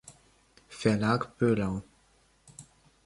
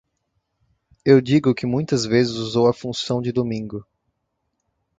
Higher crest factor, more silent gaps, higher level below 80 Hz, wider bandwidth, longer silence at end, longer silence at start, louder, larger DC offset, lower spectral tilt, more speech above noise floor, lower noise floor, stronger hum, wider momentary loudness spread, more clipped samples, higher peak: about the same, 22 dB vs 20 dB; neither; about the same, -58 dBFS vs -56 dBFS; first, 11.5 kHz vs 9.2 kHz; second, 0.45 s vs 1.15 s; second, 0.05 s vs 1.05 s; second, -29 LUFS vs -20 LUFS; neither; about the same, -6.5 dB/octave vs -6 dB/octave; second, 38 dB vs 56 dB; second, -65 dBFS vs -75 dBFS; neither; first, 24 LU vs 11 LU; neither; second, -10 dBFS vs -2 dBFS